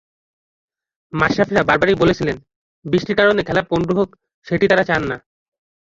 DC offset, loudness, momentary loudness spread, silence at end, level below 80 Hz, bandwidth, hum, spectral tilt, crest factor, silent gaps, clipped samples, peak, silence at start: under 0.1%; -17 LUFS; 11 LU; 0.8 s; -46 dBFS; 7.8 kHz; none; -6.5 dB/octave; 18 dB; 2.56-2.82 s, 4.34-4.42 s; under 0.1%; 0 dBFS; 1.15 s